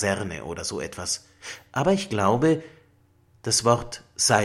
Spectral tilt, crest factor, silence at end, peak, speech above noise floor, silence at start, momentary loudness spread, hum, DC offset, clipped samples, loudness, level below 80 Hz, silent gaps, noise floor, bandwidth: -3.5 dB/octave; 22 dB; 0 s; -2 dBFS; 36 dB; 0 s; 14 LU; none; under 0.1%; under 0.1%; -24 LUFS; -54 dBFS; none; -60 dBFS; 16 kHz